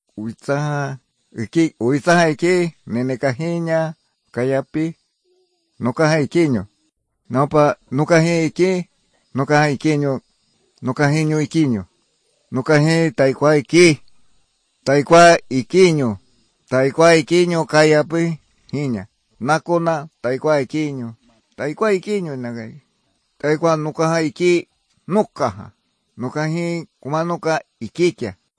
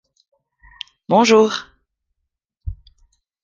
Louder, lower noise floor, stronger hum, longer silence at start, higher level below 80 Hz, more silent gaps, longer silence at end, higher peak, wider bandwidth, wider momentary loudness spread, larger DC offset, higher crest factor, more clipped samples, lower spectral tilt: second, -18 LUFS vs -15 LUFS; second, -68 dBFS vs -78 dBFS; neither; second, 0.15 s vs 1.1 s; second, -58 dBFS vs -42 dBFS; neither; second, 0.25 s vs 0.7 s; about the same, -2 dBFS vs -2 dBFS; first, 10.5 kHz vs 7.6 kHz; second, 15 LU vs 23 LU; neither; about the same, 18 dB vs 20 dB; neither; first, -6 dB/octave vs -4.5 dB/octave